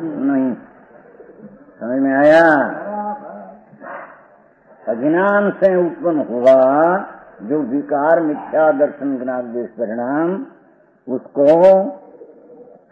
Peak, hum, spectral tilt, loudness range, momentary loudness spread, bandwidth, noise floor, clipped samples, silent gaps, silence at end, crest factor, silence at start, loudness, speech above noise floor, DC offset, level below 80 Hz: -2 dBFS; none; -8 dB/octave; 4 LU; 21 LU; 7.4 kHz; -51 dBFS; under 0.1%; none; 0.3 s; 16 dB; 0 s; -16 LUFS; 36 dB; under 0.1%; -64 dBFS